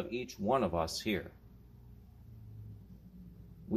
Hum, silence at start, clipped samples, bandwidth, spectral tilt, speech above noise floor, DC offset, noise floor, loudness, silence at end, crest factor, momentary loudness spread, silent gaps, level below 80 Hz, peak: none; 0 s; under 0.1%; 15.5 kHz; -5 dB/octave; 21 dB; under 0.1%; -56 dBFS; -35 LUFS; 0 s; 20 dB; 25 LU; none; -56 dBFS; -18 dBFS